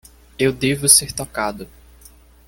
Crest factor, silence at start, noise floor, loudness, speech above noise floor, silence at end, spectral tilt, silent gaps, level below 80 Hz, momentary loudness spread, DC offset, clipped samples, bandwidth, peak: 20 dB; 0.4 s; -47 dBFS; -16 LUFS; 29 dB; 0.8 s; -2.5 dB/octave; none; -46 dBFS; 14 LU; under 0.1%; under 0.1%; 17 kHz; 0 dBFS